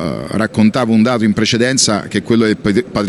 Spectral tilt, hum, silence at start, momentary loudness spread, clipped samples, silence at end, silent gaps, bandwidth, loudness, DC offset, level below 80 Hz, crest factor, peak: -4.5 dB/octave; none; 0 s; 6 LU; under 0.1%; 0 s; none; 12 kHz; -13 LUFS; under 0.1%; -44 dBFS; 12 dB; 0 dBFS